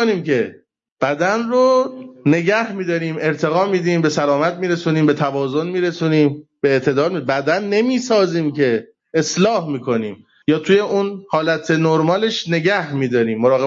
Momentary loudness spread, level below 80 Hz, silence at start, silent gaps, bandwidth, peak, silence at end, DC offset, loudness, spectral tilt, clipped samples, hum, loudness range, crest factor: 6 LU; -62 dBFS; 0 s; 0.92-0.96 s; 7.8 kHz; -4 dBFS; 0 s; under 0.1%; -18 LUFS; -6 dB/octave; under 0.1%; none; 1 LU; 14 dB